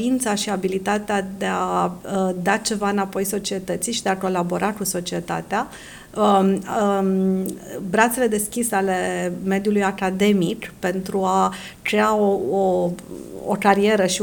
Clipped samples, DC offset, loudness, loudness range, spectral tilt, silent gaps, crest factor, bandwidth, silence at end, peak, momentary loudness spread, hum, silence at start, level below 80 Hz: under 0.1%; under 0.1%; -21 LUFS; 2 LU; -4.5 dB/octave; none; 20 dB; 19.5 kHz; 0 s; -2 dBFS; 8 LU; none; 0 s; -52 dBFS